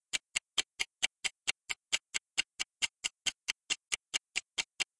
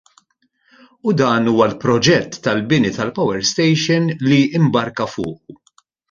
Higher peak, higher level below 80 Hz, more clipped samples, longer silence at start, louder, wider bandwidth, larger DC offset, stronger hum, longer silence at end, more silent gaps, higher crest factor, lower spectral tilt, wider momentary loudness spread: second, -10 dBFS vs -2 dBFS; second, -76 dBFS vs -52 dBFS; neither; second, 0.15 s vs 1.05 s; second, -35 LUFS vs -16 LUFS; first, 11.5 kHz vs 7.6 kHz; neither; neither; second, 0.15 s vs 0.55 s; neither; first, 28 dB vs 16 dB; second, 2.5 dB/octave vs -5 dB/octave; second, 4 LU vs 9 LU